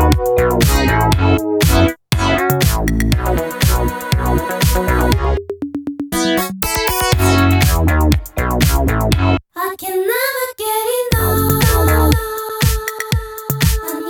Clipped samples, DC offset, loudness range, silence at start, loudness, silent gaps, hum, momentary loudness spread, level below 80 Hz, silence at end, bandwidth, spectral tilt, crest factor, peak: under 0.1%; under 0.1%; 2 LU; 0 s; -15 LUFS; none; none; 8 LU; -22 dBFS; 0 s; over 20 kHz; -5 dB/octave; 14 dB; 0 dBFS